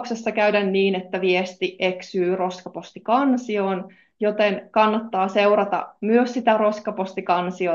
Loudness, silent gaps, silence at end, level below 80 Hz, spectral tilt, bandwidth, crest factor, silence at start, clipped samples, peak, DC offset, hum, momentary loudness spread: -21 LUFS; none; 0 s; -72 dBFS; -6 dB/octave; 7.4 kHz; 18 dB; 0 s; under 0.1%; -4 dBFS; under 0.1%; none; 9 LU